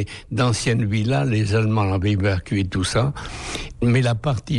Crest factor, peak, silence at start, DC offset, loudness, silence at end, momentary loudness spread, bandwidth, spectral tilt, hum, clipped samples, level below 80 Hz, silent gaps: 12 dB; -8 dBFS; 0 s; under 0.1%; -21 LUFS; 0 s; 8 LU; 11 kHz; -6 dB/octave; none; under 0.1%; -40 dBFS; none